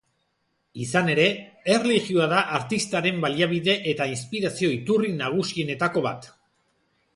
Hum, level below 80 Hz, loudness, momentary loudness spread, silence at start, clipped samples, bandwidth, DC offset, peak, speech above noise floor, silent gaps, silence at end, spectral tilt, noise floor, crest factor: none; -64 dBFS; -23 LUFS; 7 LU; 0.75 s; under 0.1%; 11.5 kHz; under 0.1%; -6 dBFS; 49 dB; none; 0.9 s; -4.5 dB/octave; -73 dBFS; 18 dB